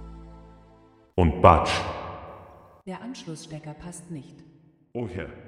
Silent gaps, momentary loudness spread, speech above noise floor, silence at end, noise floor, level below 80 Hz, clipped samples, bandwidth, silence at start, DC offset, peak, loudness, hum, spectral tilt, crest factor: none; 27 LU; 31 dB; 0 s; -56 dBFS; -40 dBFS; under 0.1%; 11 kHz; 0 s; under 0.1%; -2 dBFS; -23 LUFS; none; -6 dB/octave; 26 dB